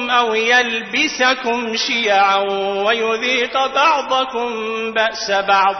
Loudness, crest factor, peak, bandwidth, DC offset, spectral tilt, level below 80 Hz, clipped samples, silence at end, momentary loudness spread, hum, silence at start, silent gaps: -16 LUFS; 14 dB; -2 dBFS; 6.4 kHz; under 0.1%; -1.5 dB/octave; -58 dBFS; under 0.1%; 0 s; 6 LU; none; 0 s; none